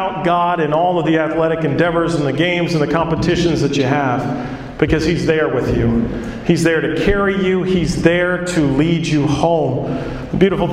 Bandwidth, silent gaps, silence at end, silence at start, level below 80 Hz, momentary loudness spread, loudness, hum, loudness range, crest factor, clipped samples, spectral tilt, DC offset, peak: 12.5 kHz; none; 0 s; 0 s; -34 dBFS; 5 LU; -16 LUFS; none; 1 LU; 16 dB; under 0.1%; -6.5 dB/octave; under 0.1%; 0 dBFS